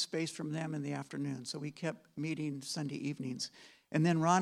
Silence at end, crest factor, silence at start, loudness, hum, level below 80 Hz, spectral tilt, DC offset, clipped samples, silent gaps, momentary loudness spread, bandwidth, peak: 0 s; 22 dB; 0 s; -37 LUFS; none; -82 dBFS; -5 dB/octave; under 0.1%; under 0.1%; none; 10 LU; 13 kHz; -14 dBFS